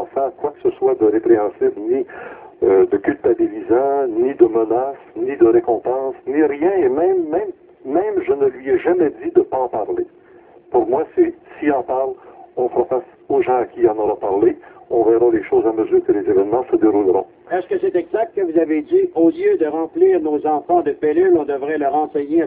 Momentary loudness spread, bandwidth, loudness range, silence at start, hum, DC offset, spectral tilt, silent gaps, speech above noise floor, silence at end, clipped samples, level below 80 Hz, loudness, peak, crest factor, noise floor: 8 LU; 3.7 kHz; 3 LU; 0 s; none; under 0.1%; -11 dB/octave; none; 29 dB; 0 s; under 0.1%; -54 dBFS; -17 LUFS; 0 dBFS; 16 dB; -46 dBFS